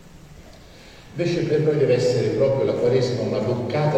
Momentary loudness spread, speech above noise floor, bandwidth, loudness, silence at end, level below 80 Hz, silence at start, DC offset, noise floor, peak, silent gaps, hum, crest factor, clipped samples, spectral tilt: 5 LU; 24 dB; 9.8 kHz; -21 LUFS; 0 s; -50 dBFS; 0.05 s; under 0.1%; -44 dBFS; -6 dBFS; none; none; 16 dB; under 0.1%; -7 dB/octave